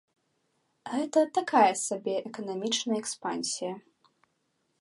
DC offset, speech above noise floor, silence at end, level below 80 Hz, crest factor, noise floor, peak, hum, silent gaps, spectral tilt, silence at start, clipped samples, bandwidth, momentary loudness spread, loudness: under 0.1%; 47 dB; 1 s; -84 dBFS; 20 dB; -76 dBFS; -10 dBFS; none; none; -2.5 dB/octave; 0.85 s; under 0.1%; 11.5 kHz; 13 LU; -29 LUFS